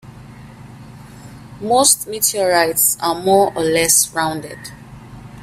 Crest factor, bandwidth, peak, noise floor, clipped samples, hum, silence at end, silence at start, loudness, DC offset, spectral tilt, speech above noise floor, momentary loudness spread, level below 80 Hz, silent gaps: 18 dB; 16 kHz; 0 dBFS; -38 dBFS; under 0.1%; 50 Hz at -45 dBFS; 0 s; 0.05 s; -14 LUFS; under 0.1%; -2 dB/octave; 22 dB; 17 LU; -50 dBFS; none